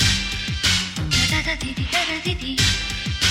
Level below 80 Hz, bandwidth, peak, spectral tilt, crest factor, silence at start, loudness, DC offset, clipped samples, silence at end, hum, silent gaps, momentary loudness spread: -32 dBFS; 16.5 kHz; -6 dBFS; -2.5 dB/octave; 16 dB; 0 s; -20 LUFS; under 0.1%; under 0.1%; 0 s; none; none; 6 LU